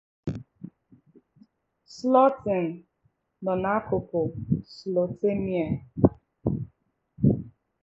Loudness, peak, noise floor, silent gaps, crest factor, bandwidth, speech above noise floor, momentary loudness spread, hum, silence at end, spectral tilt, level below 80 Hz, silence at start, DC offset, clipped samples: -27 LUFS; -2 dBFS; -71 dBFS; none; 26 dB; 7.8 kHz; 46 dB; 20 LU; none; 0.35 s; -9 dB/octave; -50 dBFS; 0.25 s; under 0.1%; under 0.1%